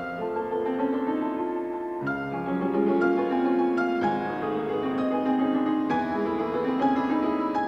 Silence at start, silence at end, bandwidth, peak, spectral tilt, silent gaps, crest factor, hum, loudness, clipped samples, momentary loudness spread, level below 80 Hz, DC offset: 0 s; 0 s; 6.4 kHz; -12 dBFS; -8 dB/octave; none; 12 dB; none; -26 LUFS; under 0.1%; 6 LU; -60 dBFS; under 0.1%